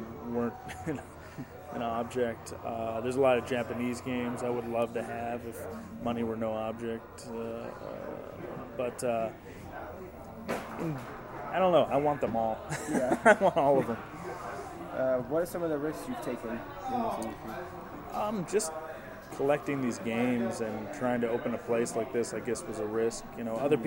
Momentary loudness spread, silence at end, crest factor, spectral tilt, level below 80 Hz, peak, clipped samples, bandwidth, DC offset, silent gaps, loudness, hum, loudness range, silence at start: 15 LU; 0 s; 24 dB; -5.5 dB/octave; -58 dBFS; -8 dBFS; under 0.1%; 16.5 kHz; under 0.1%; none; -32 LUFS; none; 9 LU; 0 s